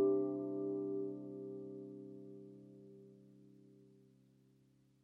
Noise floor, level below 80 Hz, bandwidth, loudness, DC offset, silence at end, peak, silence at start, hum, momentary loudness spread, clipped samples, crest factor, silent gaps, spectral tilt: -71 dBFS; -90 dBFS; 1.3 kHz; -43 LUFS; under 0.1%; 1.15 s; -24 dBFS; 0 s; none; 24 LU; under 0.1%; 18 dB; none; -11.5 dB/octave